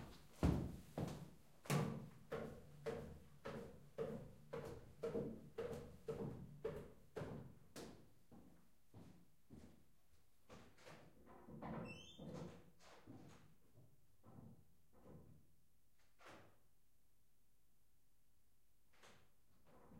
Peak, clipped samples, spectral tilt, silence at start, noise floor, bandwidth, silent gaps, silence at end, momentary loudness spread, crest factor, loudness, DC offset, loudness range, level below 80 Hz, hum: -26 dBFS; under 0.1%; -6.5 dB/octave; 0 s; -82 dBFS; 16 kHz; none; 0 s; 22 LU; 26 dB; -50 LUFS; under 0.1%; 18 LU; -64 dBFS; none